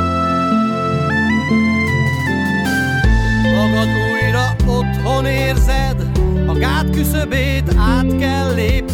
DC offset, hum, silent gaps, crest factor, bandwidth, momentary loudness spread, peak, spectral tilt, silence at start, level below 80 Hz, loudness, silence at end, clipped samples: under 0.1%; none; none; 12 dB; 17 kHz; 3 LU; -2 dBFS; -6 dB/octave; 0 s; -20 dBFS; -16 LUFS; 0 s; under 0.1%